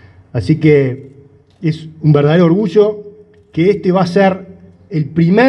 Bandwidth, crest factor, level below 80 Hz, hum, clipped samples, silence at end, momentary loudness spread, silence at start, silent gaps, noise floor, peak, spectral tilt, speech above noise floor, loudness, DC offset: 8.6 kHz; 14 dB; -50 dBFS; none; under 0.1%; 0 s; 13 LU; 0.35 s; none; -39 dBFS; 0 dBFS; -8.5 dB/octave; 27 dB; -13 LUFS; under 0.1%